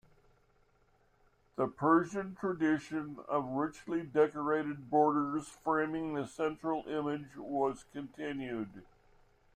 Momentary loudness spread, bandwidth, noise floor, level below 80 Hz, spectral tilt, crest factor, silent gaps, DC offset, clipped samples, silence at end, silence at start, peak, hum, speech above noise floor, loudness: 12 LU; 9.8 kHz; -70 dBFS; -68 dBFS; -7 dB/octave; 20 dB; none; under 0.1%; under 0.1%; 0.7 s; 1.6 s; -16 dBFS; none; 36 dB; -34 LUFS